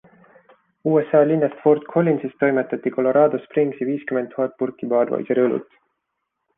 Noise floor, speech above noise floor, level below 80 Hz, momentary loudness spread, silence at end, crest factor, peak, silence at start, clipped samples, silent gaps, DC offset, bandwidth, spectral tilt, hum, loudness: -77 dBFS; 58 dB; -68 dBFS; 8 LU; 0.95 s; 18 dB; -4 dBFS; 0.85 s; under 0.1%; none; under 0.1%; 3.7 kHz; -11 dB/octave; none; -20 LUFS